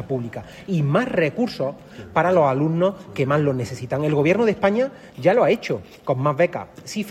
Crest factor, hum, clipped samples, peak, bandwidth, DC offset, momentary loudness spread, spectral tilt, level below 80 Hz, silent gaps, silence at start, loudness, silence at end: 16 dB; none; under 0.1%; -4 dBFS; 14 kHz; under 0.1%; 11 LU; -7 dB/octave; -56 dBFS; none; 0 s; -21 LUFS; 0 s